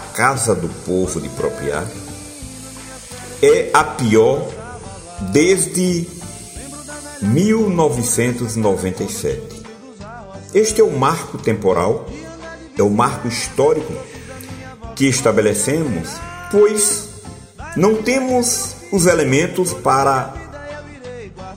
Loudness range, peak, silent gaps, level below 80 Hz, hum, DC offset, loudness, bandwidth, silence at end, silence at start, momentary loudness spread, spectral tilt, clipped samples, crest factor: 3 LU; 0 dBFS; none; -42 dBFS; none; under 0.1%; -16 LUFS; 16 kHz; 0 s; 0 s; 19 LU; -4.5 dB/octave; under 0.1%; 18 dB